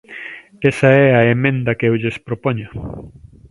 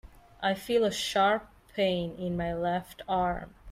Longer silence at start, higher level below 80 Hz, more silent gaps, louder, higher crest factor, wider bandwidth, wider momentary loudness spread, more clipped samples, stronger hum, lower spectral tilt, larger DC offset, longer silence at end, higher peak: about the same, 0.1 s vs 0.05 s; first, -46 dBFS vs -52 dBFS; neither; first, -15 LUFS vs -30 LUFS; about the same, 16 dB vs 16 dB; second, 11.5 kHz vs 16 kHz; first, 20 LU vs 8 LU; neither; neither; first, -8 dB/octave vs -4.5 dB/octave; neither; first, 0.4 s vs 0 s; first, 0 dBFS vs -14 dBFS